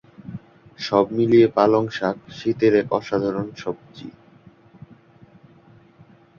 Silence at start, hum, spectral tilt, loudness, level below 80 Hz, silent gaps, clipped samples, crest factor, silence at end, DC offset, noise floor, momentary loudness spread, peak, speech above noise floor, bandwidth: 0.2 s; none; -7 dB/octave; -20 LUFS; -58 dBFS; none; under 0.1%; 20 dB; 2.3 s; under 0.1%; -51 dBFS; 23 LU; -2 dBFS; 31 dB; 7 kHz